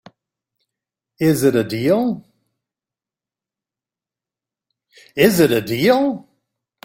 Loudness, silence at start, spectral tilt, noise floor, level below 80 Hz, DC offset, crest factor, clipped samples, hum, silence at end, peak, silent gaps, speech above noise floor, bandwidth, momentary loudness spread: -17 LUFS; 1.2 s; -5.5 dB/octave; -89 dBFS; -56 dBFS; under 0.1%; 20 dB; under 0.1%; none; 0.65 s; -2 dBFS; none; 74 dB; 16.5 kHz; 12 LU